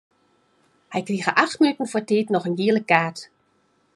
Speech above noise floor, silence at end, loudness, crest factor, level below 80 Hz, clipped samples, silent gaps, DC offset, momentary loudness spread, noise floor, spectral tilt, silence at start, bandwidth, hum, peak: 44 dB; 0.7 s; -21 LUFS; 22 dB; -74 dBFS; under 0.1%; none; under 0.1%; 11 LU; -65 dBFS; -5.5 dB/octave; 0.9 s; 11.5 kHz; none; -2 dBFS